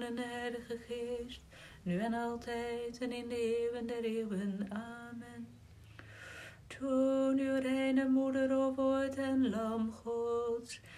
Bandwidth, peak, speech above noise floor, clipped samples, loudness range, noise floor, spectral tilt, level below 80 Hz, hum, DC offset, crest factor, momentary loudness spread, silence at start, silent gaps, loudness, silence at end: 13 kHz; -22 dBFS; 20 dB; under 0.1%; 7 LU; -55 dBFS; -6 dB/octave; -64 dBFS; none; under 0.1%; 14 dB; 18 LU; 0 s; none; -36 LUFS; 0 s